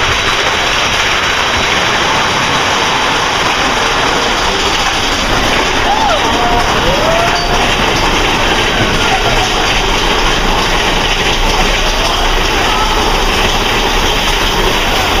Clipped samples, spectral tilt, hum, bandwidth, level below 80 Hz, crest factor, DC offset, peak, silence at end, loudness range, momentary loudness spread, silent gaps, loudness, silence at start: under 0.1%; -2.5 dB/octave; none; 16 kHz; -20 dBFS; 12 dB; under 0.1%; 0 dBFS; 0 s; 1 LU; 1 LU; none; -11 LUFS; 0 s